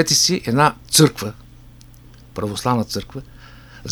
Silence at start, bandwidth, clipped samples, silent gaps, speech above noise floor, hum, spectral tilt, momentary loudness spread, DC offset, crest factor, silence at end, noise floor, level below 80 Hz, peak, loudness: 0 s; over 20 kHz; under 0.1%; none; 25 dB; none; -3.5 dB/octave; 21 LU; under 0.1%; 20 dB; 0 s; -44 dBFS; -46 dBFS; 0 dBFS; -17 LUFS